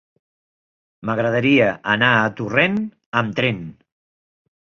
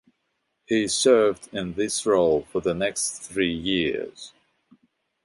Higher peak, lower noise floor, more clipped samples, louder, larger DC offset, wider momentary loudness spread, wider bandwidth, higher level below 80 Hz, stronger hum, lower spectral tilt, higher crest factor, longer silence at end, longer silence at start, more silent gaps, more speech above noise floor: about the same, -2 dBFS vs -4 dBFS; first, under -90 dBFS vs -75 dBFS; neither; first, -18 LUFS vs -23 LUFS; neither; about the same, 11 LU vs 13 LU; second, 7 kHz vs 11.5 kHz; about the same, -56 dBFS vs -54 dBFS; neither; first, -6.5 dB/octave vs -3.5 dB/octave; about the same, 20 dB vs 20 dB; about the same, 1.05 s vs 0.95 s; first, 1.05 s vs 0.7 s; first, 3.06-3.12 s vs none; first, over 71 dB vs 52 dB